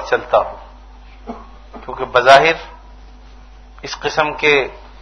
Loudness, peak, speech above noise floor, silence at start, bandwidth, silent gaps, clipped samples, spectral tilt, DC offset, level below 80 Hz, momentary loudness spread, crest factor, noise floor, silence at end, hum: -14 LUFS; 0 dBFS; 25 dB; 0 s; 11 kHz; none; 0.2%; -3.5 dB/octave; under 0.1%; -40 dBFS; 25 LU; 18 dB; -39 dBFS; 0.15 s; none